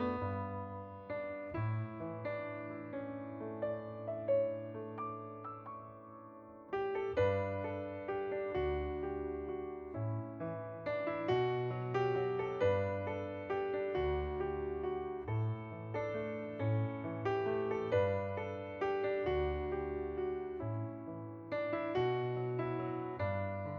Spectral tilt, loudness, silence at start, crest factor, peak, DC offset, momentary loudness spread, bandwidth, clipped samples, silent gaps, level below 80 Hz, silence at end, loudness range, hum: -9 dB/octave; -38 LUFS; 0 s; 16 dB; -22 dBFS; under 0.1%; 10 LU; 7 kHz; under 0.1%; none; -56 dBFS; 0 s; 4 LU; none